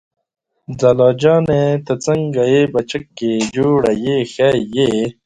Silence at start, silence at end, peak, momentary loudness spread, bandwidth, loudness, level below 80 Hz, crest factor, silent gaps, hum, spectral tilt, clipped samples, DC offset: 0.7 s; 0.15 s; 0 dBFS; 7 LU; 10.5 kHz; -15 LUFS; -48 dBFS; 16 dB; none; none; -6 dB/octave; under 0.1%; under 0.1%